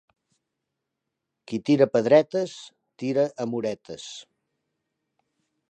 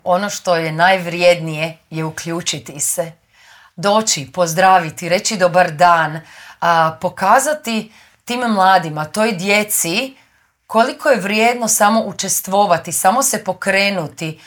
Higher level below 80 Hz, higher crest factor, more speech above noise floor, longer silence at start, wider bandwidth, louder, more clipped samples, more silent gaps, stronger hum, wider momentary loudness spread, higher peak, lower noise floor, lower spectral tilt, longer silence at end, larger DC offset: second, -74 dBFS vs -62 dBFS; first, 22 dB vs 16 dB; first, 60 dB vs 31 dB; first, 1.5 s vs 0.05 s; second, 9.4 kHz vs over 20 kHz; second, -24 LUFS vs -15 LUFS; neither; neither; neither; first, 19 LU vs 10 LU; second, -4 dBFS vs 0 dBFS; first, -83 dBFS vs -47 dBFS; first, -6 dB/octave vs -3 dB/octave; first, 1.5 s vs 0.1 s; neither